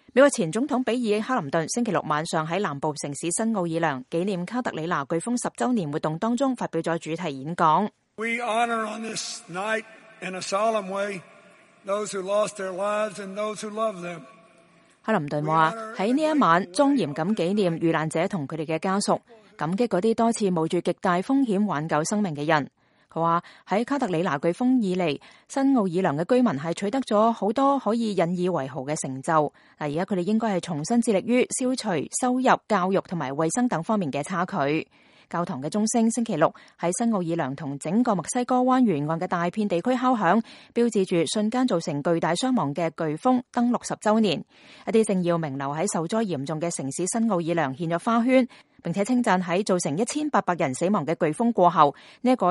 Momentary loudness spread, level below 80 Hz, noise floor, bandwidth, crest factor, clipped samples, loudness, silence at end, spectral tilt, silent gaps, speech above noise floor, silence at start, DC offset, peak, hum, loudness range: 8 LU; -70 dBFS; -57 dBFS; 11.5 kHz; 22 dB; under 0.1%; -25 LUFS; 0 s; -5 dB/octave; none; 33 dB; 0.15 s; under 0.1%; -2 dBFS; none; 4 LU